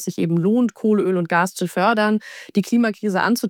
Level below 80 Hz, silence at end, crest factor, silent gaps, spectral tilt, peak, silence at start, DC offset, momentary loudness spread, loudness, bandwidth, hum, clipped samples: -72 dBFS; 0 s; 14 dB; none; -6 dB/octave; -4 dBFS; 0 s; under 0.1%; 5 LU; -19 LUFS; 18.5 kHz; none; under 0.1%